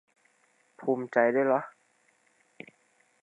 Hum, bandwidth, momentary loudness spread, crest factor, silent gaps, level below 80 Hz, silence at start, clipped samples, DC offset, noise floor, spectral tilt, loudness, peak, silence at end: none; 10 kHz; 25 LU; 22 dB; none; -90 dBFS; 0.8 s; under 0.1%; under 0.1%; -68 dBFS; -8 dB/octave; -27 LUFS; -8 dBFS; 1.55 s